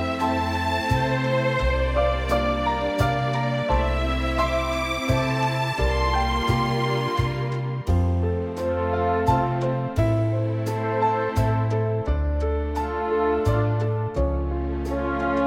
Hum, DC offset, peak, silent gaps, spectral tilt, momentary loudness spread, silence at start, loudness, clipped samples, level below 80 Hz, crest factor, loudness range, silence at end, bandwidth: none; under 0.1%; -6 dBFS; none; -6.5 dB/octave; 4 LU; 0 s; -24 LUFS; under 0.1%; -30 dBFS; 16 dB; 1 LU; 0 s; 16 kHz